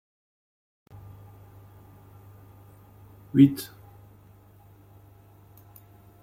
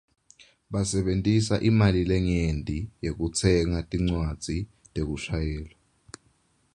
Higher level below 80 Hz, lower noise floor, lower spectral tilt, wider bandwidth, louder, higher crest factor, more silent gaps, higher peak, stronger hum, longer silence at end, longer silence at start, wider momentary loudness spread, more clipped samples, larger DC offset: second, -62 dBFS vs -38 dBFS; second, -54 dBFS vs -66 dBFS; first, -7.5 dB/octave vs -6 dB/octave; first, 16 kHz vs 11 kHz; first, -22 LUFS vs -26 LUFS; first, 26 dB vs 20 dB; neither; about the same, -4 dBFS vs -6 dBFS; neither; first, 2.6 s vs 1.1 s; first, 3.35 s vs 0.7 s; first, 30 LU vs 11 LU; neither; neither